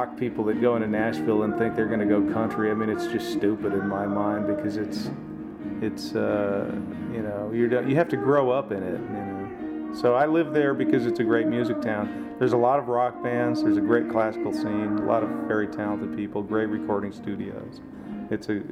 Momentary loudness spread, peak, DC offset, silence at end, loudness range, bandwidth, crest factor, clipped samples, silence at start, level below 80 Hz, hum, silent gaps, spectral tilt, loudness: 11 LU; -8 dBFS; under 0.1%; 0 s; 4 LU; 14 kHz; 16 dB; under 0.1%; 0 s; -58 dBFS; none; none; -7.5 dB/octave; -25 LUFS